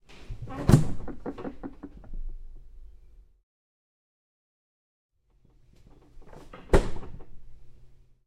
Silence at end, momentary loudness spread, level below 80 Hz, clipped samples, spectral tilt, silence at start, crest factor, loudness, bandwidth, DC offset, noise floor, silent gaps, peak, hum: 0.3 s; 26 LU; -38 dBFS; under 0.1%; -7.5 dB/octave; 0.1 s; 28 dB; -28 LUFS; 16 kHz; under 0.1%; -62 dBFS; 3.43-5.09 s; -2 dBFS; none